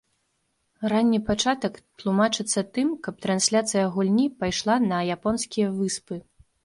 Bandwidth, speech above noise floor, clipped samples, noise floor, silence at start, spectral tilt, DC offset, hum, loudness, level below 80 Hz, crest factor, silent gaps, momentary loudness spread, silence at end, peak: 11.5 kHz; 49 dB; under 0.1%; -73 dBFS; 0.8 s; -4 dB/octave; under 0.1%; none; -24 LUFS; -54 dBFS; 18 dB; none; 9 LU; 0.45 s; -8 dBFS